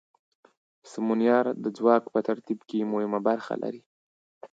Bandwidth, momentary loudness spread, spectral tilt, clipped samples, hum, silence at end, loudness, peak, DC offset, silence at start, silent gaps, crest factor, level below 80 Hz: 7.8 kHz; 11 LU; -7 dB/octave; under 0.1%; none; 0.05 s; -27 LUFS; -8 dBFS; under 0.1%; 0.85 s; 3.86-4.41 s; 20 dB; -80 dBFS